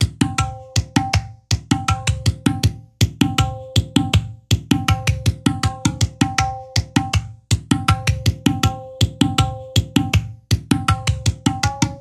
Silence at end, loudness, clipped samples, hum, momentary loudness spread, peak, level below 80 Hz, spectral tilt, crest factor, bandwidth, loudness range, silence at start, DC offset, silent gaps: 0 s; -20 LUFS; under 0.1%; none; 5 LU; 0 dBFS; -30 dBFS; -4.5 dB/octave; 20 dB; 15 kHz; 1 LU; 0 s; under 0.1%; none